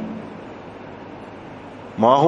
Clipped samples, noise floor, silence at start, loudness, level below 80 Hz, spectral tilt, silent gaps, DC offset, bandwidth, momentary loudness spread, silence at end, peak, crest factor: under 0.1%; -37 dBFS; 0 s; -27 LUFS; -58 dBFS; -7.5 dB/octave; none; under 0.1%; 7.8 kHz; 18 LU; 0 s; -2 dBFS; 20 dB